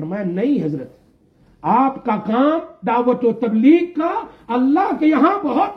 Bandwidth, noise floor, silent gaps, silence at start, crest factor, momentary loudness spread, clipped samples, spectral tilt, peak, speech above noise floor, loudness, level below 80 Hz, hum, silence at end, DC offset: 5.8 kHz; -54 dBFS; none; 0 s; 14 dB; 10 LU; under 0.1%; -9 dB/octave; -2 dBFS; 37 dB; -17 LUFS; -58 dBFS; none; 0 s; under 0.1%